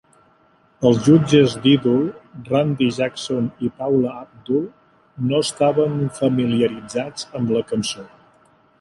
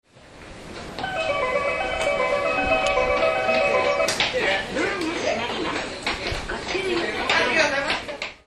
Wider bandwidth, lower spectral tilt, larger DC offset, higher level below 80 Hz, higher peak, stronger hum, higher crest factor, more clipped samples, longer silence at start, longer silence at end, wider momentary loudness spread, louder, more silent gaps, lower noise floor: about the same, 11.5 kHz vs 12.5 kHz; first, -6 dB/octave vs -3 dB/octave; neither; second, -56 dBFS vs -44 dBFS; about the same, -2 dBFS vs -4 dBFS; neither; about the same, 18 dB vs 18 dB; neither; first, 0.8 s vs 0.2 s; first, 0.75 s vs 0.1 s; first, 12 LU vs 9 LU; first, -19 LUFS vs -22 LUFS; neither; first, -57 dBFS vs -44 dBFS